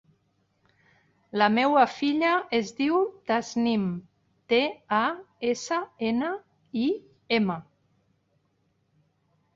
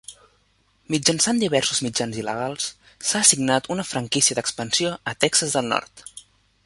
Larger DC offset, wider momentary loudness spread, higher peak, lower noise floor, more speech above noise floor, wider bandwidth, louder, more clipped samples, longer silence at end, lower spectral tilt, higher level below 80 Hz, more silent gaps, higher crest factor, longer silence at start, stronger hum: neither; about the same, 10 LU vs 11 LU; second, -8 dBFS vs -2 dBFS; first, -71 dBFS vs -63 dBFS; first, 46 dB vs 41 dB; second, 7.8 kHz vs 12 kHz; second, -26 LUFS vs -21 LUFS; neither; first, 1.95 s vs 0.45 s; first, -5 dB/octave vs -2.5 dB/octave; second, -70 dBFS vs -60 dBFS; neither; about the same, 20 dB vs 22 dB; first, 1.35 s vs 0.1 s; neither